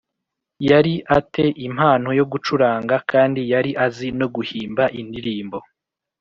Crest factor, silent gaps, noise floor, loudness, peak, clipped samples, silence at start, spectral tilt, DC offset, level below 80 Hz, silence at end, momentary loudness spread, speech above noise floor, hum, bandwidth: 18 dB; none; -81 dBFS; -19 LUFS; -2 dBFS; under 0.1%; 0.6 s; -5 dB/octave; under 0.1%; -52 dBFS; 0.6 s; 11 LU; 62 dB; none; 7.4 kHz